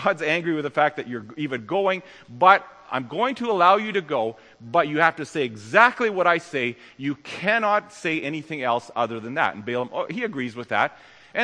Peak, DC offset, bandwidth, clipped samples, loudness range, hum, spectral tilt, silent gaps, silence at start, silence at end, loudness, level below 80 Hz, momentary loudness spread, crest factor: 0 dBFS; under 0.1%; 10.5 kHz; under 0.1%; 5 LU; none; -5 dB/octave; none; 0 s; 0 s; -23 LUFS; -72 dBFS; 13 LU; 22 dB